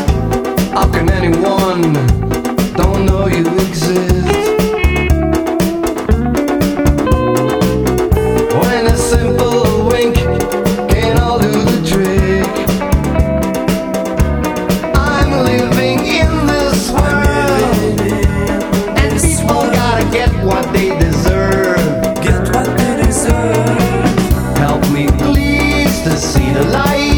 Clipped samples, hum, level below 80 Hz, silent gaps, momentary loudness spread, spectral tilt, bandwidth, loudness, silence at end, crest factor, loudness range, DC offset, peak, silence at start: under 0.1%; none; -20 dBFS; none; 3 LU; -5.5 dB/octave; over 20 kHz; -13 LUFS; 0 s; 12 dB; 1 LU; under 0.1%; 0 dBFS; 0 s